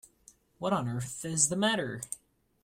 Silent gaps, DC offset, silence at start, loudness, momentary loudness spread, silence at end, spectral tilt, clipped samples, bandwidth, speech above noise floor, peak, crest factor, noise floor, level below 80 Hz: none; under 0.1%; 0.6 s; -30 LUFS; 14 LU; 0.45 s; -3 dB/octave; under 0.1%; 16 kHz; 31 dB; -10 dBFS; 22 dB; -62 dBFS; -66 dBFS